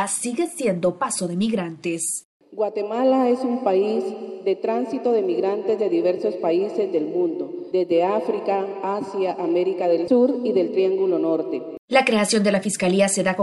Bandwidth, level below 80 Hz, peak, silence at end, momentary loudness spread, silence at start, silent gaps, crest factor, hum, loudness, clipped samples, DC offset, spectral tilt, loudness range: 12.5 kHz; -70 dBFS; -4 dBFS; 0 s; 7 LU; 0 s; 2.25-2.40 s, 11.79-11.88 s; 18 dB; none; -22 LUFS; under 0.1%; under 0.1%; -4.5 dB/octave; 3 LU